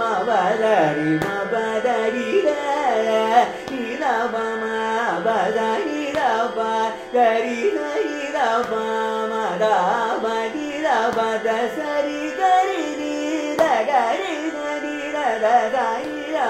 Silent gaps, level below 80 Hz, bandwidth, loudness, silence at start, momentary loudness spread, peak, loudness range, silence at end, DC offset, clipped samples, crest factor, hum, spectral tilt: none; -60 dBFS; 15.5 kHz; -21 LUFS; 0 s; 6 LU; -4 dBFS; 1 LU; 0 s; under 0.1%; under 0.1%; 16 dB; none; -4.5 dB/octave